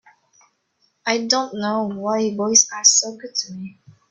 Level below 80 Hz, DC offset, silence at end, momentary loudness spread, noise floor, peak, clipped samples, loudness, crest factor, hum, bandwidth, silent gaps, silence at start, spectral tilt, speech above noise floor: -70 dBFS; under 0.1%; 0.4 s; 16 LU; -67 dBFS; 0 dBFS; under 0.1%; -18 LUFS; 22 dB; none; 8.4 kHz; none; 1.05 s; -1.5 dB/octave; 46 dB